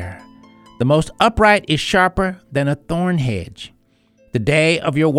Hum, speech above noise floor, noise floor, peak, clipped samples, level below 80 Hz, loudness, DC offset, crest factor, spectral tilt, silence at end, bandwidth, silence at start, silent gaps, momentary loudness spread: none; 40 dB; -56 dBFS; 0 dBFS; under 0.1%; -38 dBFS; -17 LUFS; under 0.1%; 16 dB; -5.5 dB/octave; 0 s; 14 kHz; 0 s; none; 13 LU